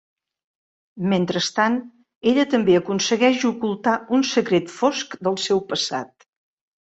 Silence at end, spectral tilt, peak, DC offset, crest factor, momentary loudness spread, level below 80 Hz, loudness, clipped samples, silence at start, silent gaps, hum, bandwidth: 0.75 s; -4.5 dB/octave; -4 dBFS; under 0.1%; 18 dB; 7 LU; -64 dBFS; -21 LUFS; under 0.1%; 0.95 s; 2.16-2.21 s; none; 8.2 kHz